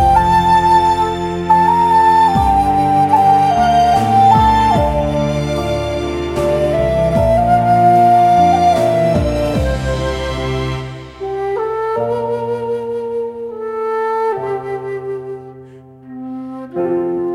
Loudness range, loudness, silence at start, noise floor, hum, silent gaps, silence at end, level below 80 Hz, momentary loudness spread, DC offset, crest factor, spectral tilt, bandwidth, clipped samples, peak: 10 LU; -14 LUFS; 0 s; -38 dBFS; none; none; 0 s; -30 dBFS; 14 LU; under 0.1%; 14 dB; -6.5 dB/octave; 15.5 kHz; under 0.1%; 0 dBFS